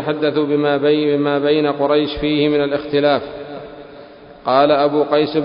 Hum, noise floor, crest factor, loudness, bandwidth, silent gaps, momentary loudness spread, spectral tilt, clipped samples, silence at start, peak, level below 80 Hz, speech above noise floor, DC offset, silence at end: none; -39 dBFS; 16 dB; -16 LUFS; 5.4 kHz; none; 16 LU; -11 dB/octave; under 0.1%; 0 s; 0 dBFS; -46 dBFS; 23 dB; under 0.1%; 0 s